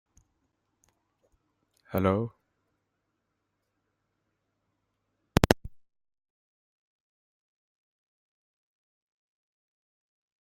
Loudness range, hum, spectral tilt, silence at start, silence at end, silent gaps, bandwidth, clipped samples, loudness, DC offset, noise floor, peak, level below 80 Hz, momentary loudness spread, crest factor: 2 LU; none; -6 dB/octave; 1.9 s; 4.65 s; none; 13 kHz; under 0.1%; -28 LUFS; under 0.1%; -80 dBFS; -2 dBFS; -50 dBFS; 9 LU; 34 dB